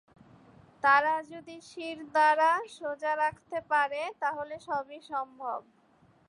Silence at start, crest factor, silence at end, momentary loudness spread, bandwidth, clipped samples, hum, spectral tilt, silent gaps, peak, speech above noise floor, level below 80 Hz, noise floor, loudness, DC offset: 0.85 s; 20 dB; 0.7 s; 16 LU; 11 kHz; under 0.1%; none; -3.5 dB/octave; none; -10 dBFS; 34 dB; -74 dBFS; -64 dBFS; -29 LUFS; under 0.1%